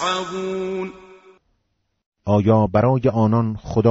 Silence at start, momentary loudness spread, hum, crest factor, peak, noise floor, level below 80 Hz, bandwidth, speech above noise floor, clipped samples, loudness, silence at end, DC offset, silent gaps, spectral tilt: 0 s; 12 LU; none; 16 dB; -4 dBFS; -71 dBFS; -46 dBFS; 8 kHz; 53 dB; under 0.1%; -19 LUFS; 0 s; under 0.1%; 2.06-2.12 s; -7 dB/octave